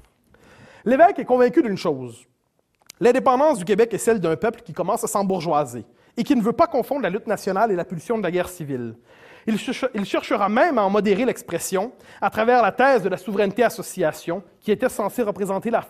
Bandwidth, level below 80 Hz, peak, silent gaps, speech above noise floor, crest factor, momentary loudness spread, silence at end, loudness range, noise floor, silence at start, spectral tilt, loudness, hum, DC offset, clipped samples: 15.5 kHz; -58 dBFS; -2 dBFS; none; 45 dB; 18 dB; 12 LU; 0.05 s; 4 LU; -66 dBFS; 0.85 s; -5.5 dB/octave; -21 LUFS; none; under 0.1%; under 0.1%